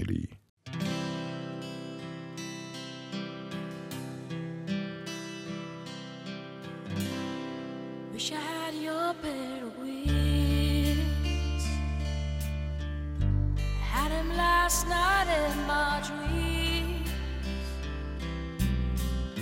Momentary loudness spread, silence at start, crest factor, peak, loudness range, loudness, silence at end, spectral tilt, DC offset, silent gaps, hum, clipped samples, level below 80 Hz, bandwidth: 14 LU; 0 s; 18 dB; -14 dBFS; 11 LU; -32 LUFS; 0 s; -4.5 dB/octave; under 0.1%; 0.49-0.57 s; none; under 0.1%; -36 dBFS; 16 kHz